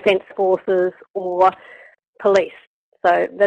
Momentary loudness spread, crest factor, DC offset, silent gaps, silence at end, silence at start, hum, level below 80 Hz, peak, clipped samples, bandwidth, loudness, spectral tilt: 9 LU; 16 dB; under 0.1%; 1.10-1.14 s, 2.07-2.13 s, 2.67-2.92 s; 0 s; 0.05 s; none; -62 dBFS; -4 dBFS; under 0.1%; 8.8 kHz; -19 LUFS; -5.5 dB/octave